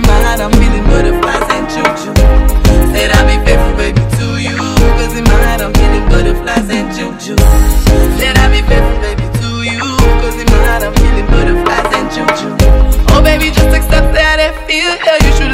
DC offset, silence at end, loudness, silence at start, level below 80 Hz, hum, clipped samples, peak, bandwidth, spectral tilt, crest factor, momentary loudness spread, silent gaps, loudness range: under 0.1%; 0 s; -11 LUFS; 0 s; -10 dBFS; none; 1%; 0 dBFS; 16.5 kHz; -5 dB/octave; 8 dB; 5 LU; none; 2 LU